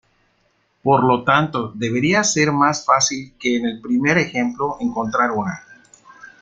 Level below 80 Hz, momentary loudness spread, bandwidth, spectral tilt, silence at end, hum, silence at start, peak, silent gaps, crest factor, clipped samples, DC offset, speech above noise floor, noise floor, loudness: -56 dBFS; 8 LU; 9.4 kHz; -4 dB/octave; 0.15 s; none; 0.85 s; -2 dBFS; none; 18 dB; under 0.1%; under 0.1%; 45 dB; -64 dBFS; -18 LUFS